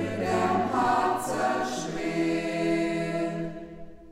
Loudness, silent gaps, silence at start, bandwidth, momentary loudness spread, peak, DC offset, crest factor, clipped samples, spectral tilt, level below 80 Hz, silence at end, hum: -27 LUFS; none; 0 s; 16 kHz; 11 LU; -14 dBFS; under 0.1%; 14 dB; under 0.1%; -5.5 dB/octave; -54 dBFS; 0 s; none